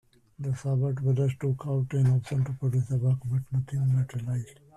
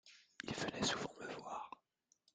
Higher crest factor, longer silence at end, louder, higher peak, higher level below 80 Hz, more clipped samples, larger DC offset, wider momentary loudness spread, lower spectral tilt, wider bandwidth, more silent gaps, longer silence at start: second, 12 dB vs 22 dB; second, 0.25 s vs 0.65 s; first, -28 LUFS vs -43 LUFS; first, -16 dBFS vs -24 dBFS; first, -58 dBFS vs -72 dBFS; neither; neither; second, 7 LU vs 17 LU; first, -9 dB/octave vs -3 dB/octave; about the same, 10 kHz vs 9.6 kHz; neither; first, 0.4 s vs 0.05 s